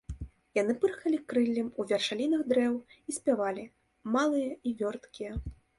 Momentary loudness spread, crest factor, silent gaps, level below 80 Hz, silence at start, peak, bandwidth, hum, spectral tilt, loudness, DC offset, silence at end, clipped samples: 13 LU; 16 dB; none; -52 dBFS; 0.1 s; -14 dBFS; 11.5 kHz; none; -5 dB/octave; -31 LUFS; under 0.1%; 0.25 s; under 0.1%